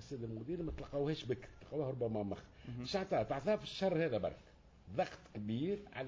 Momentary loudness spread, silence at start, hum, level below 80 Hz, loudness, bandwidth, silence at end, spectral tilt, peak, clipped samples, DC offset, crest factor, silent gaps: 9 LU; 0 s; none; -60 dBFS; -40 LUFS; 8 kHz; 0 s; -6.5 dB/octave; -24 dBFS; under 0.1%; under 0.1%; 16 dB; none